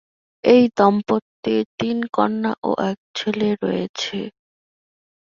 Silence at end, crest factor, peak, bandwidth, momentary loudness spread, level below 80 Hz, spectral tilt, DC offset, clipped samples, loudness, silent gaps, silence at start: 1 s; 20 dB; -2 dBFS; 7.4 kHz; 11 LU; -62 dBFS; -6 dB/octave; under 0.1%; under 0.1%; -20 LUFS; 1.22-1.43 s, 1.66-1.78 s, 2.58-2.62 s, 2.98-3.14 s, 3.89-3.94 s; 0.45 s